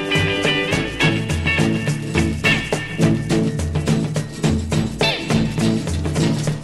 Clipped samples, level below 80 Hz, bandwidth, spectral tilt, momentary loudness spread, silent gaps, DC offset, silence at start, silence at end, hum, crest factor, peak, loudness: under 0.1%; -34 dBFS; 13 kHz; -5 dB/octave; 4 LU; none; under 0.1%; 0 s; 0 s; none; 16 dB; -2 dBFS; -19 LUFS